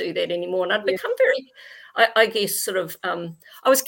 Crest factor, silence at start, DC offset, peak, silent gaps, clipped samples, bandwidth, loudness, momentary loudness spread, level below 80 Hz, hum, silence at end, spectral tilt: 20 dB; 0 s; under 0.1%; -4 dBFS; none; under 0.1%; 17 kHz; -22 LUFS; 10 LU; -74 dBFS; none; 0 s; -2 dB/octave